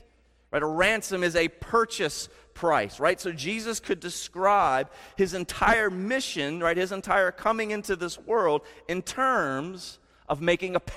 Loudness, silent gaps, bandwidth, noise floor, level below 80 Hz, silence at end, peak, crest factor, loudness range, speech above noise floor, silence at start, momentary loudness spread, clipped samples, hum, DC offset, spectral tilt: -26 LUFS; none; 16 kHz; -61 dBFS; -50 dBFS; 0 s; -8 dBFS; 18 dB; 2 LU; 35 dB; 0.55 s; 10 LU; under 0.1%; none; under 0.1%; -3.5 dB/octave